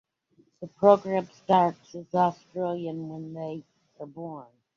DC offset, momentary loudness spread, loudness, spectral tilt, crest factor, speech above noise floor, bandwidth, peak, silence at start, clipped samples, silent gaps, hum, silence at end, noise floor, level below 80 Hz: under 0.1%; 23 LU; -26 LUFS; -7.5 dB/octave; 24 dB; 39 dB; 7.2 kHz; -4 dBFS; 0.6 s; under 0.1%; none; none; 0.3 s; -65 dBFS; -74 dBFS